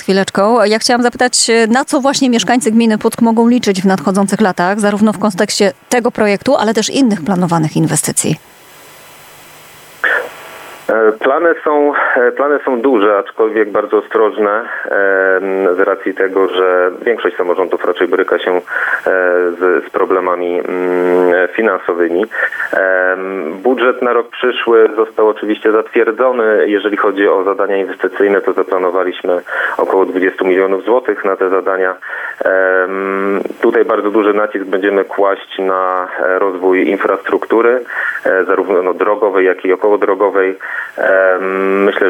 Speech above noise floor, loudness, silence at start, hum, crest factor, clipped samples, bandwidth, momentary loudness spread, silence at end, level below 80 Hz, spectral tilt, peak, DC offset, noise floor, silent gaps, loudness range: 26 dB; -13 LUFS; 0 s; none; 12 dB; under 0.1%; 17 kHz; 5 LU; 0 s; -62 dBFS; -4.5 dB/octave; 0 dBFS; under 0.1%; -39 dBFS; none; 2 LU